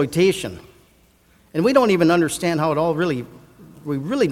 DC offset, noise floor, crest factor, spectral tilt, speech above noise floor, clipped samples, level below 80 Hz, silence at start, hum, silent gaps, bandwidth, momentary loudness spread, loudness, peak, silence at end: under 0.1%; -56 dBFS; 18 dB; -5.5 dB/octave; 37 dB; under 0.1%; -52 dBFS; 0 s; none; none; 16 kHz; 13 LU; -19 LUFS; -2 dBFS; 0 s